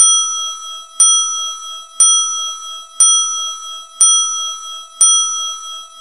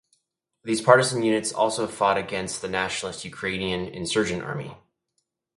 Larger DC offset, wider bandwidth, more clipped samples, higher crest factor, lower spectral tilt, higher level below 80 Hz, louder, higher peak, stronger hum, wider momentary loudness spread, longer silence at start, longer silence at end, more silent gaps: first, 0.5% vs under 0.1%; first, 16.5 kHz vs 11.5 kHz; neither; second, 16 dB vs 26 dB; second, 5 dB/octave vs -4 dB/octave; about the same, -60 dBFS vs -56 dBFS; first, -11 LUFS vs -24 LUFS; about the same, 0 dBFS vs 0 dBFS; neither; first, 18 LU vs 14 LU; second, 0 s vs 0.65 s; second, 0 s vs 0.8 s; neither